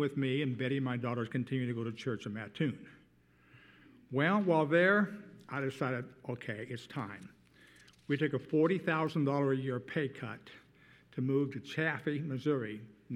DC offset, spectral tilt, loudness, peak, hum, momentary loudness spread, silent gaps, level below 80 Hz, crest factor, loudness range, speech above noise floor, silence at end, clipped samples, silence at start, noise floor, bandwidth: under 0.1%; -7.5 dB/octave; -34 LUFS; -16 dBFS; none; 14 LU; none; -76 dBFS; 20 dB; 6 LU; 32 dB; 0 s; under 0.1%; 0 s; -66 dBFS; 11.5 kHz